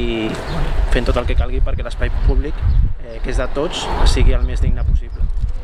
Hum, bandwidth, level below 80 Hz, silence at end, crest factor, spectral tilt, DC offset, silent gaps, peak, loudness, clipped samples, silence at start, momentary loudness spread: none; 10.5 kHz; -16 dBFS; 0 s; 14 dB; -6 dB/octave; under 0.1%; none; -2 dBFS; -20 LUFS; under 0.1%; 0 s; 6 LU